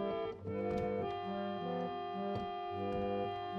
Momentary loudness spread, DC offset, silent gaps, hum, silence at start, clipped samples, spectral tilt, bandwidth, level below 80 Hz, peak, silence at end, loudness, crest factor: 3 LU; under 0.1%; none; none; 0 s; under 0.1%; -8 dB/octave; 8 kHz; -62 dBFS; -26 dBFS; 0 s; -39 LUFS; 12 dB